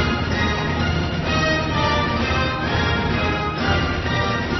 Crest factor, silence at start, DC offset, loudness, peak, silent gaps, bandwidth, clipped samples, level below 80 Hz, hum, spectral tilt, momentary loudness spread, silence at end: 14 dB; 0 s; under 0.1%; -20 LUFS; -6 dBFS; none; 6.2 kHz; under 0.1%; -30 dBFS; none; -5.5 dB/octave; 2 LU; 0 s